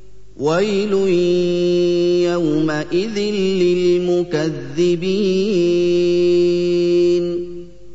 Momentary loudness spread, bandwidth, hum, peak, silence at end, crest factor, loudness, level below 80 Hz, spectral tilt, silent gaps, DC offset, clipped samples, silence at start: 5 LU; 8 kHz; 50 Hz at -45 dBFS; -6 dBFS; 0 s; 10 dB; -17 LUFS; -48 dBFS; -6.5 dB/octave; none; 2%; under 0.1%; 0.35 s